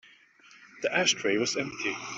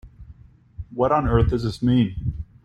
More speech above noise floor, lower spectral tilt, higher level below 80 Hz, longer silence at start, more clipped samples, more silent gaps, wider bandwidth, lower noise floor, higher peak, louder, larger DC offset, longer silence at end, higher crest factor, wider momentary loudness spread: about the same, 28 dB vs 28 dB; second, -2 dB/octave vs -8.5 dB/octave; second, -72 dBFS vs -34 dBFS; about the same, 0.05 s vs 0.05 s; neither; neither; second, 8.2 kHz vs 10 kHz; first, -57 dBFS vs -47 dBFS; second, -10 dBFS vs -4 dBFS; second, -27 LUFS vs -22 LUFS; neither; second, 0 s vs 0.2 s; about the same, 22 dB vs 18 dB; second, 8 LU vs 13 LU